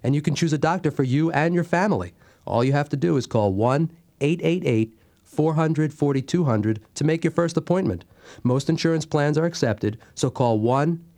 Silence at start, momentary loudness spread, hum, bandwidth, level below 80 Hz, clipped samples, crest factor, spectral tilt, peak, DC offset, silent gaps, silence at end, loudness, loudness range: 0.05 s; 6 LU; none; 11.5 kHz; -58 dBFS; under 0.1%; 18 dB; -7 dB/octave; -4 dBFS; under 0.1%; none; 0.15 s; -23 LUFS; 1 LU